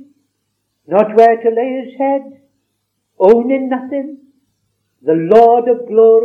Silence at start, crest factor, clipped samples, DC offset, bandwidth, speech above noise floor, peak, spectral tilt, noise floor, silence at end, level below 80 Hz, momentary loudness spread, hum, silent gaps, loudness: 0.9 s; 14 dB; 0.6%; under 0.1%; 5 kHz; 58 dB; 0 dBFS; -8 dB/octave; -69 dBFS; 0 s; -60 dBFS; 13 LU; none; none; -12 LUFS